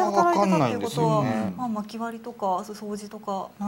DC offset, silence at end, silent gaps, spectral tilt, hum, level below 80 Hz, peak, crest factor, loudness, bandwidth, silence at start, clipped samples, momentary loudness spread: under 0.1%; 0 s; none; -6.5 dB/octave; none; -66 dBFS; -8 dBFS; 18 dB; -26 LUFS; 16 kHz; 0 s; under 0.1%; 14 LU